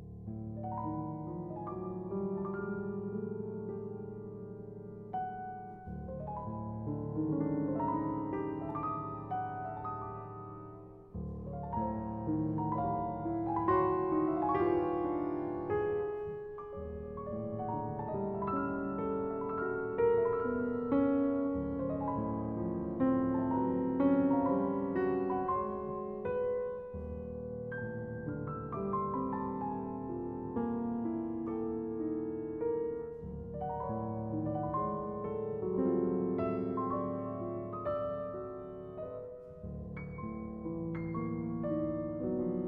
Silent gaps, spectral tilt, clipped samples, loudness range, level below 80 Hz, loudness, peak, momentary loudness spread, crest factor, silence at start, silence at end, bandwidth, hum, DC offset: none; -9.5 dB/octave; under 0.1%; 8 LU; -56 dBFS; -36 LUFS; -18 dBFS; 12 LU; 18 dB; 0 s; 0 s; 3.8 kHz; none; under 0.1%